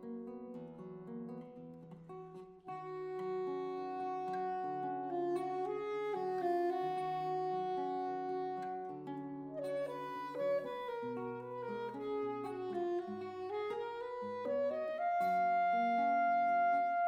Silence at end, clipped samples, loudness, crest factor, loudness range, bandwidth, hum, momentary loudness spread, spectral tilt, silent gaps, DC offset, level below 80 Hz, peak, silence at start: 0 s; under 0.1%; -38 LUFS; 12 dB; 8 LU; 9.8 kHz; none; 16 LU; -7 dB/octave; none; under 0.1%; -80 dBFS; -26 dBFS; 0 s